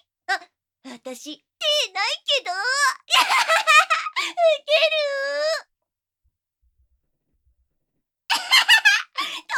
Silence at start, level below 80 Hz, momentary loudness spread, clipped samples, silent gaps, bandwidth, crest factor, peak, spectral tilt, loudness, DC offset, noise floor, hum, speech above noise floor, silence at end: 0.3 s; -76 dBFS; 15 LU; under 0.1%; none; 18 kHz; 22 dB; 0 dBFS; 2.5 dB/octave; -19 LUFS; under 0.1%; -84 dBFS; none; 61 dB; 0 s